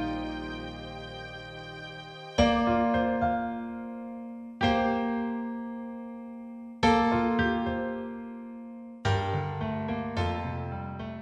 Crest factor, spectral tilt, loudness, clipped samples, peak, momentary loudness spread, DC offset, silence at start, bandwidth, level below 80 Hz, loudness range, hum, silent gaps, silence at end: 20 dB; -6.5 dB/octave; -30 LUFS; under 0.1%; -10 dBFS; 16 LU; under 0.1%; 0 s; 9 kHz; -48 dBFS; 4 LU; none; none; 0 s